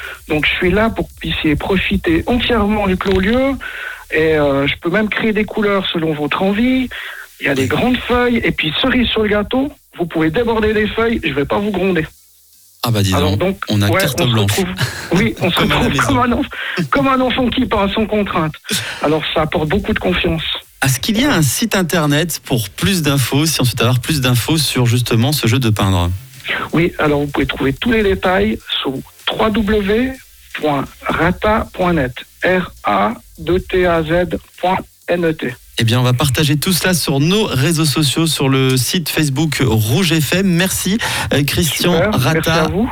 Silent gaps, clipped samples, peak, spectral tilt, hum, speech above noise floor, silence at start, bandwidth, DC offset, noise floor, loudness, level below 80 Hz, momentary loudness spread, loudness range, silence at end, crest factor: none; under 0.1%; -4 dBFS; -5 dB/octave; none; 32 dB; 0 s; over 20 kHz; under 0.1%; -47 dBFS; -15 LUFS; -34 dBFS; 6 LU; 3 LU; 0 s; 12 dB